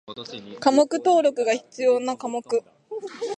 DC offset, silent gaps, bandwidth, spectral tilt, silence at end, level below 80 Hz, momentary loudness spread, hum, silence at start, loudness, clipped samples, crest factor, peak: under 0.1%; none; 10 kHz; -3.5 dB/octave; 0 s; -74 dBFS; 17 LU; none; 0.1 s; -22 LUFS; under 0.1%; 20 dB; -4 dBFS